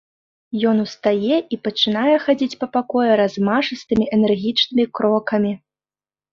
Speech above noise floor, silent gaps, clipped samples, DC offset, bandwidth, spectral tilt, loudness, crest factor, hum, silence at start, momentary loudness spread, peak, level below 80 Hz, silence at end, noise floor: over 72 dB; none; under 0.1%; under 0.1%; 7 kHz; -6 dB/octave; -19 LUFS; 16 dB; none; 0.5 s; 5 LU; -4 dBFS; -56 dBFS; 0.75 s; under -90 dBFS